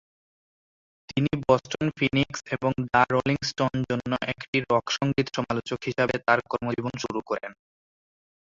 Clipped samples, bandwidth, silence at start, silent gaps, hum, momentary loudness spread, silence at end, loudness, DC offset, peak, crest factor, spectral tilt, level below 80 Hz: under 0.1%; 7.8 kHz; 1.1 s; 4.48-4.53 s; none; 8 LU; 0.95 s; -26 LUFS; under 0.1%; -6 dBFS; 22 dB; -5.5 dB/octave; -56 dBFS